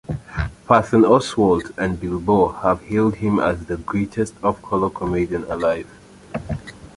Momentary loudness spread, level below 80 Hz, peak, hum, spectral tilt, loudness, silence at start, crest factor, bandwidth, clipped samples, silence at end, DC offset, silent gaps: 13 LU; -40 dBFS; -2 dBFS; none; -7 dB/octave; -20 LUFS; 0.1 s; 18 dB; 11.5 kHz; under 0.1%; 0.1 s; under 0.1%; none